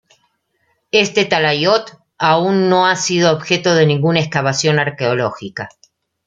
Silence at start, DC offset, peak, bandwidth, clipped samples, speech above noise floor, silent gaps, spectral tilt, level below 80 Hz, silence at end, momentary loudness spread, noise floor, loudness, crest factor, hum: 0.95 s; under 0.1%; 0 dBFS; 9.2 kHz; under 0.1%; 50 dB; none; -4.5 dB/octave; -58 dBFS; 0.6 s; 7 LU; -65 dBFS; -15 LUFS; 16 dB; none